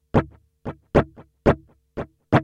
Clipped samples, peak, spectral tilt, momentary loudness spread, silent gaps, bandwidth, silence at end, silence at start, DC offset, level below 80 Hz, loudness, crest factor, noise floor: under 0.1%; -2 dBFS; -8.5 dB/octave; 16 LU; none; 9.6 kHz; 0 s; 0.15 s; under 0.1%; -38 dBFS; -23 LUFS; 22 dB; -37 dBFS